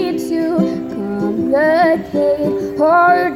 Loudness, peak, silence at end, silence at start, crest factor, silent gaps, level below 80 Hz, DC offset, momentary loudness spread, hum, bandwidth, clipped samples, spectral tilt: -15 LUFS; -2 dBFS; 0 s; 0 s; 12 dB; none; -50 dBFS; under 0.1%; 8 LU; none; 15.5 kHz; under 0.1%; -7 dB/octave